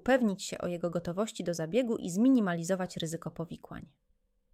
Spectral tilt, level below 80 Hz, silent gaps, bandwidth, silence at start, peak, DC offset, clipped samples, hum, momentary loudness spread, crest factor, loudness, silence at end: -5.5 dB/octave; -62 dBFS; none; 15 kHz; 0.05 s; -14 dBFS; under 0.1%; under 0.1%; none; 16 LU; 18 dB; -31 LUFS; 0.7 s